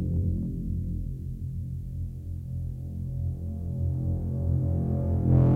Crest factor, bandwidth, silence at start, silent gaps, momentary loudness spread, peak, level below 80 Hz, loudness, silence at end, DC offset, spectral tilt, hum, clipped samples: 16 dB; 1.9 kHz; 0 s; none; 9 LU; -10 dBFS; -36 dBFS; -30 LUFS; 0 s; under 0.1%; -12 dB/octave; none; under 0.1%